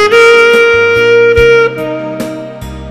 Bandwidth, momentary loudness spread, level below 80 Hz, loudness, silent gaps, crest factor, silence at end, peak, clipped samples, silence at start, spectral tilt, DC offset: 14 kHz; 17 LU; -30 dBFS; -6 LUFS; none; 8 dB; 0 s; 0 dBFS; 1%; 0 s; -4 dB/octave; under 0.1%